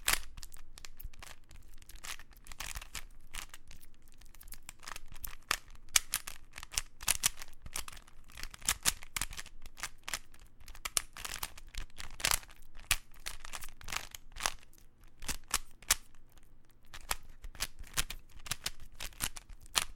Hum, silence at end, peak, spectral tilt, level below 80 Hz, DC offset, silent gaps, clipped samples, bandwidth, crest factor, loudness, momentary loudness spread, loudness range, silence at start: none; 0 s; -2 dBFS; 0.5 dB/octave; -48 dBFS; under 0.1%; none; under 0.1%; 17 kHz; 36 dB; -37 LUFS; 21 LU; 12 LU; 0 s